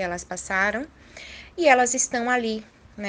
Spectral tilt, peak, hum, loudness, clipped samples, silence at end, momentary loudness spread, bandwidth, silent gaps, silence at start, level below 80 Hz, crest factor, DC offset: -2.5 dB/octave; -4 dBFS; none; -22 LUFS; under 0.1%; 0 s; 21 LU; 10 kHz; none; 0 s; -54 dBFS; 22 dB; under 0.1%